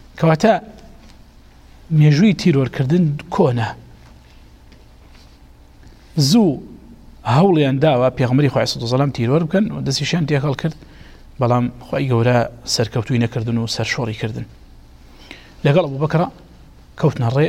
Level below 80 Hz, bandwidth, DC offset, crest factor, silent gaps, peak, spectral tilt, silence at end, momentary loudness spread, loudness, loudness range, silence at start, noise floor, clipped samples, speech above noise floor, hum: -44 dBFS; 14 kHz; under 0.1%; 16 dB; none; -2 dBFS; -6.5 dB/octave; 0 s; 10 LU; -17 LUFS; 6 LU; 0.15 s; -44 dBFS; under 0.1%; 28 dB; none